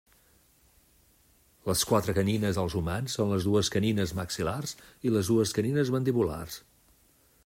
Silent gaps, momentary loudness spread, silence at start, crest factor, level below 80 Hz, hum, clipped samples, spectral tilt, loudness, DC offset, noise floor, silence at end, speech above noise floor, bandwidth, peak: none; 10 LU; 1.65 s; 18 dB; -54 dBFS; none; under 0.1%; -5.5 dB/octave; -28 LUFS; under 0.1%; -64 dBFS; 0.85 s; 36 dB; 16 kHz; -12 dBFS